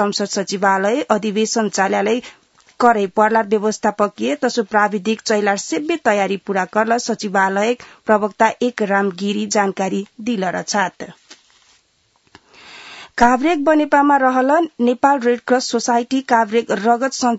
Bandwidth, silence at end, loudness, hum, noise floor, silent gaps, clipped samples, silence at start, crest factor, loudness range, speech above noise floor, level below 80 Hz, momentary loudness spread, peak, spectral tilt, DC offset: 8 kHz; 0 s; -17 LUFS; none; -61 dBFS; none; under 0.1%; 0 s; 18 dB; 6 LU; 44 dB; -52 dBFS; 7 LU; 0 dBFS; -4 dB/octave; under 0.1%